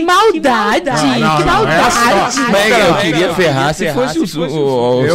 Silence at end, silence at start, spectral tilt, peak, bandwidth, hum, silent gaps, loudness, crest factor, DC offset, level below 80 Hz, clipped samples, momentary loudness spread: 0 s; 0 s; -4.5 dB/octave; -2 dBFS; 16.5 kHz; none; none; -12 LUFS; 8 dB; under 0.1%; -36 dBFS; under 0.1%; 6 LU